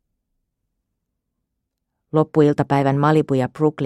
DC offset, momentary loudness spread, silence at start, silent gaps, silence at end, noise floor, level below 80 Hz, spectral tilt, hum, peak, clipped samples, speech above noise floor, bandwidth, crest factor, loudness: under 0.1%; 5 LU; 2.15 s; none; 0 s; -78 dBFS; -58 dBFS; -8.5 dB/octave; none; -2 dBFS; under 0.1%; 61 dB; 10.5 kHz; 18 dB; -18 LUFS